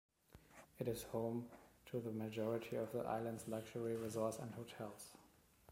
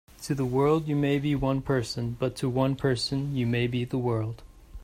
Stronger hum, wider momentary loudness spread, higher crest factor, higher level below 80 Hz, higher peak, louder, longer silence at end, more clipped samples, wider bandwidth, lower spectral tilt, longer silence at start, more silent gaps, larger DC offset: neither; first, 16 LU vs 7 LU; about the same, 18 dB vs 16 dB; second, -74 dBFS vs -48 dBFS; second, -28 dBFS vs -12 dBFS; second, -45 LUFS vs -27 LUFS; about the same, 0 s vs 0 s; neither; about the same, 16.5 kHz vs 15.5 kHz; about the same, -6 dB/octave vs -6.5 dB/octave; first, 0.35 s vs 0.2 s; neither; neither